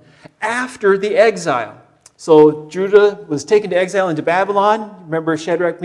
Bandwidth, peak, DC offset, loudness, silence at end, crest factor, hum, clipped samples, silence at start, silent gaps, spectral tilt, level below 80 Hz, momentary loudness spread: 11.5 kHz; 0 dBFS; under 0.1%; -15 LUFS; 0 s; 16 dB; none; 0.1%; 0.4 s; none; -5.5 dB/octave; -64 dBFS; 11 LU